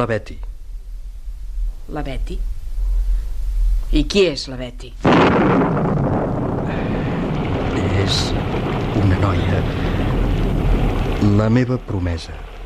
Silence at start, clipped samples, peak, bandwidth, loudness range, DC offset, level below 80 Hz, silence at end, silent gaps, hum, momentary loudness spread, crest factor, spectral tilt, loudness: 0 s; under 0.1%; -4 dBFS; 11 kHz; 8 LU; under 0.1%; -24 dBFS; 0 s; none; none; 16 LU; 14 dB; -6.5 dB/octave; -19 LUFS